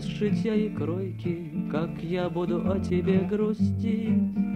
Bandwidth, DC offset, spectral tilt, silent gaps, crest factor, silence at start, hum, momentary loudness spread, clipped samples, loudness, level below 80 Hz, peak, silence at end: 8.8 kHz; under 0.1%; -8.5 dB/octave; none; 16 dB; 0 s; none; 6 LU; under 0.1%; -27 LUFS; -50 dBFS; -12 dBFS; 0 s